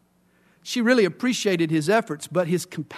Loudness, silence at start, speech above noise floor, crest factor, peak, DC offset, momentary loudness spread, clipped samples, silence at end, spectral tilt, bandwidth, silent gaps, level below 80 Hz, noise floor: -23 LUFS; 0.65 s; 39 dB; 16 dB; -6 dBFS; under 0.1%; 8 LU; under 0.1%; 0 s; -5 dB/octave; 13.5 kHz; none; -72 dBFS; -62 dBFS